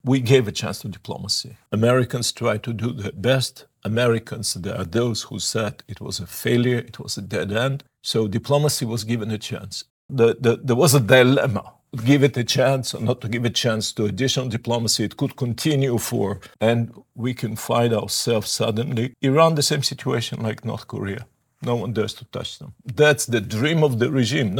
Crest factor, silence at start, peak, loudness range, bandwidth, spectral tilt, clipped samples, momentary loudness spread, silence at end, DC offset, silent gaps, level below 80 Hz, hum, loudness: 20 dB; 0.05 s; 0 dBFS; 6 LU; 19.5 kHz; -5 dB/octave; under 0.1%; 13 LU; 0 s; under 0.1%; 9.90-10.09 s; -60 dBFS; none; -21 LUFS